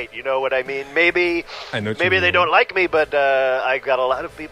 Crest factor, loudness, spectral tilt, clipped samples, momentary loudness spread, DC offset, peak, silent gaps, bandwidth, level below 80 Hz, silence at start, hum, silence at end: 18 dB; -18 LUFS; -5 dB/octave; under 0.1%; 10 LU; under 0.1%; -2 dBFS; none; 12.5 kHz; -52 dBFS; 0 s; none; 0 s